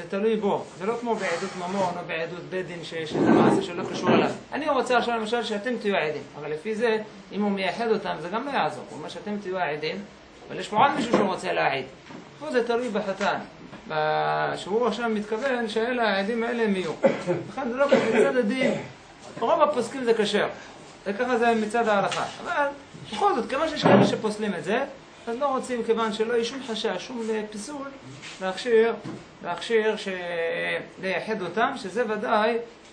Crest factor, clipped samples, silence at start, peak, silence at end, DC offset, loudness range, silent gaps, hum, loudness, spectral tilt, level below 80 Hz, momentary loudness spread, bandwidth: 24 dB; under 0.1%; 0 s; -2 dBFS; 0 s; under 0.1%; 4 LU; none; none; -25 LUFS; -5 dB/octave; -64 dBFS; 13 LU; 10 kHz